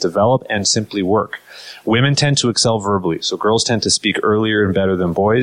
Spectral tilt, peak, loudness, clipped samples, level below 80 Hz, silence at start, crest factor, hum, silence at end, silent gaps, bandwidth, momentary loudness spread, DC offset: -4 dB/octave; -4 dBFS; -16 LUFS; under 0.1%; -48 dBFS; 0 s; 14 dB; none; 0 s; none; 11.5 kHz; 5 LU; under 0.1%